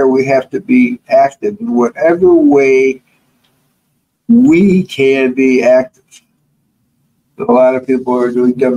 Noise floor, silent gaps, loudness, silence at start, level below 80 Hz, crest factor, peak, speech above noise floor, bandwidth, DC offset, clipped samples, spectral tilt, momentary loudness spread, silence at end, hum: -63 dBFS; none; -11 LUFS; 0 s; -54 dBFS; 10 dB; 0 dBFS; 53 dB; 10 kHz; under 0.1%; under 0.1%; -7 dB/octave; 8 LU; 0 s; none